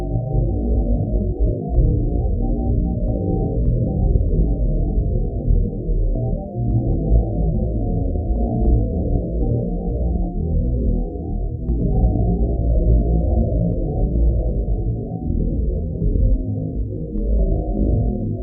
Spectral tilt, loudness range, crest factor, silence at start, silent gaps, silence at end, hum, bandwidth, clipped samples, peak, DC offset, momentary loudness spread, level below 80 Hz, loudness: -16.5 dB/octave; 2 LU; 14 dB; 0 s; none; 0 s; none; 0.8 kHz; under 0.1%; -4 dBFS; under 0.1%; 5 LU; -20 dBFS; -21 LUFS